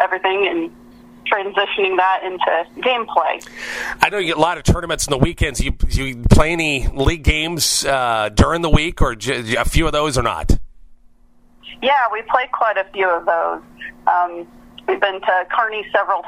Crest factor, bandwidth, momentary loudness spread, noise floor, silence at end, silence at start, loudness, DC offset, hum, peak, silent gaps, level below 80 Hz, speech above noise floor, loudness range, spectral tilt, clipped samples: 18 dB; 16 kHz; 8 LU; -49 dBFS; 0 s; 0 s; -18 LUFS; under 0.1%; none; 0 dBFS; none; -26 dBFS; 32 dB; 3 LU; -4 dB/octave; under 0.1%